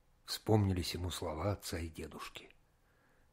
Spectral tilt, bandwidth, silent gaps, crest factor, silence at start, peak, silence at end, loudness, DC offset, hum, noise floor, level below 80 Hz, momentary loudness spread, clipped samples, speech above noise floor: -5.5 dB/octave; 16 kHz; none; 24 dB; 0.25 s; -16 dBFS; 0.85 s; -38 LUFS; under 0.1%; none; -71 dBFS; -56 dBFS; 15 LU; under 0.1%; 34 dB